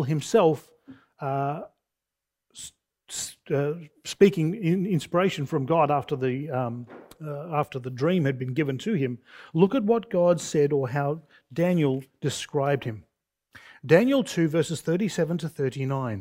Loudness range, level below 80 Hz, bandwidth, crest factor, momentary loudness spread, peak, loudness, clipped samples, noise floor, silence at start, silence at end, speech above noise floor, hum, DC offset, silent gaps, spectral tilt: 4 LU; -66 dBFS; 16 kHz; 22 dB; 16 LU; -4 dBFS; -25 LUFS; under 0.1%; -87 dBFS; 0 s; 0 s; 62 dB; none; under 0.1%; none; -6.5 dB/octave